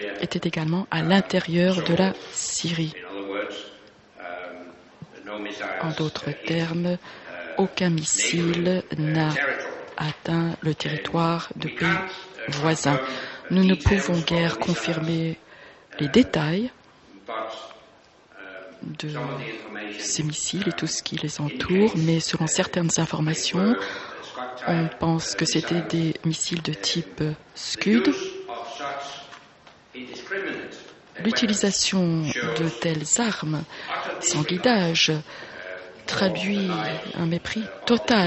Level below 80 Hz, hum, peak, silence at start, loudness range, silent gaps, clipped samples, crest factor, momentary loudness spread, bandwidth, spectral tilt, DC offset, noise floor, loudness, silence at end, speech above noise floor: -50 dBFS; none; -4 dBFS; 0 s; 7 LU; none; under 0.1%; 20 dB; 15 LU; 8.4 kHz; -4.5 dB/octave; under 0.1%; -53 dBFS; -24 LUFS; 0 s; 30 dB